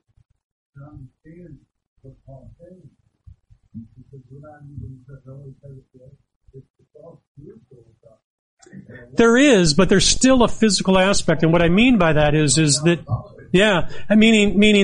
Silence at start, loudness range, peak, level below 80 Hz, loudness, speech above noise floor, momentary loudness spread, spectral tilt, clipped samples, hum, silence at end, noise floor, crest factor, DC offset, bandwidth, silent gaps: 0.8 s; 5 LU; -2 dBFS; -38 dBFS; -16 LUFS; 31 dB; 15 LU; -4.5 dB/octave; under 0.1%; none; 0 s; -49 dBFS; 16 dB; under 0.1%; 11 kHz; 1.87-1.96 s, 6.36-6.41 s, 6.70-6.74 s, 7.27-7.35 s, 8.24-8.57 s